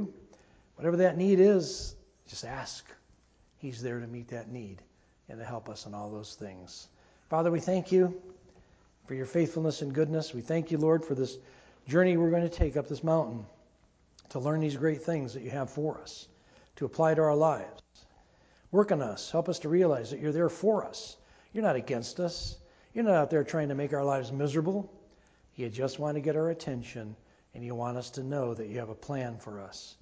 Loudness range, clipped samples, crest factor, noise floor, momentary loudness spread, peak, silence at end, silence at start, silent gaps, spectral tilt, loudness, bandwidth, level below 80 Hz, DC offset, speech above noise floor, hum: 11 LU; under 0.1%; 20 dB; -65 dBFS; 18 LU; -12 dBFS; 0.1 s; 0 s; none; -6.5 dB/octave; -30 LUFS; 8 kHz; -52 dBFS; under 0.1%; 35 dB; none